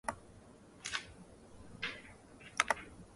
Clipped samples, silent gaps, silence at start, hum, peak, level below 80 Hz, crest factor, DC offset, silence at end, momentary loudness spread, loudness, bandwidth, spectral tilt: under 0.1%; none; 0.05 s; none; -8 dBFS; -64 dBFS; 34 dB; under 0.1%; 0 s; 24 LU; -39 LUFS; 11.5 kHz; -1.5 dB/octave